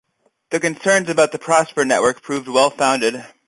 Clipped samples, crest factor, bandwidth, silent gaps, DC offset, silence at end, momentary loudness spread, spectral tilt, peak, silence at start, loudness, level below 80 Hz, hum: under 0.1%; 16 dB; 11.5 kHz; none; under 0.1%; 0.2 s; 6 LU; -3 dB/octave; -2 dBFS; 0.5 s; -17 LUFS; -62 dBFS; none